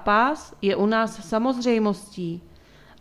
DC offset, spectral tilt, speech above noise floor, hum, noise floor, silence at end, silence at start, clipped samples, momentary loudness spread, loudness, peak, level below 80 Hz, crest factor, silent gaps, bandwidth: under 0.1%; -5.5 dB/octave; 27 dB; none; -50 dBFS; 0.6 s; 0 s; under 0.1%; 12 LU; -24 LUFS; -8 dBFS; -54 dBFS; 16 dB; none; 12.5 kHz